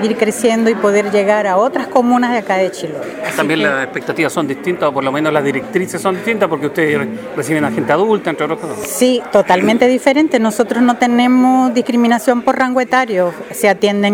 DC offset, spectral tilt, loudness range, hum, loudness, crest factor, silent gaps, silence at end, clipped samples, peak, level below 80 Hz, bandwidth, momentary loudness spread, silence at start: under 0.1%; -5 dB/octave; 4 LU; none; -14 LUFS; 14 dB; none; 0 s; under 0.1%; 0 dBFS; -58 dBFS; 17 kHz; 7 LU; 0 s